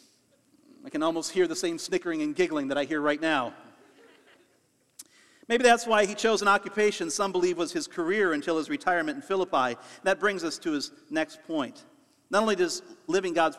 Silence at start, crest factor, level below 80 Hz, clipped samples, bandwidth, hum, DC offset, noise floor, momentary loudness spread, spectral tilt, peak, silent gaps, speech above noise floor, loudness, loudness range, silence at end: 0.85 s; 20 dB; -68 dBFS; under 0.1%; 14 kHz; none; under 0.1%; -68 dBFS; 8 LU; -3.5 dB/octave; -8 dBFS; none; 41 dB; -27 LUFS; 5 LU; 0 s